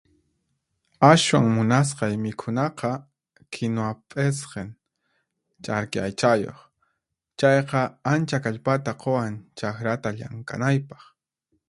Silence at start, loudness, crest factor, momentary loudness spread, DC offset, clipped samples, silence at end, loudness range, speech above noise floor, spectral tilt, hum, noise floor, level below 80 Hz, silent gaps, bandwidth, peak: 1 s; -23 LUFS; 24 dB; 15 LU; under 0.1%; under 0.1%; 0.75 s; 7 LU; 55 dB; -5.5 dB/octave; none; -78 dBFS; -60 dBFS; none; 11.5 kHz; 0 dBFS